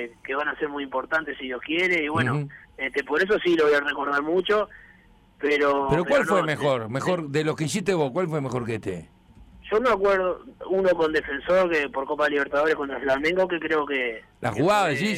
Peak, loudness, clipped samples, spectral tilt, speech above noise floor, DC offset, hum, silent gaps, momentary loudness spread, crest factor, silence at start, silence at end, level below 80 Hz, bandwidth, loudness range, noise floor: -8 dBFS; -24 LUFS; under 0.1%; -5.5 dB/octave; 31 dB; under 0.1%; none; none; 9 LU; 16 dB; 0 s; 0 s; -54 dBFS; 15.5 kHz; 3 LU; -55 dBFS